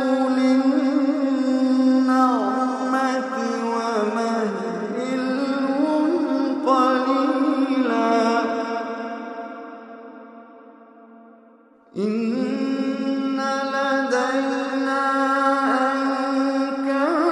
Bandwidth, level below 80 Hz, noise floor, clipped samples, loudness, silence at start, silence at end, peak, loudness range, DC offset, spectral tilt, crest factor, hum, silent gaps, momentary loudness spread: 10 kHz; -78 dBFS; -52 dBFS; under 0.1%; -21 LUFS; 0 s; 0 s; -6 dBFS; 9 LU; under 0.1%; -5 dB/octave; 16 dB; none; none; 9 LU